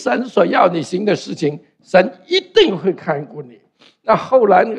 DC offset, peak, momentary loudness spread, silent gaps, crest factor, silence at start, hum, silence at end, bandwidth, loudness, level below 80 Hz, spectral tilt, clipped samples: under 0.1%; 0 dBFS; 11 LU; none; 16 dB; 0 s; none; 0 s; 9.6 kHz; -16 LUFS; -58 dBFS; -5.5 dB/octave; under 0.1%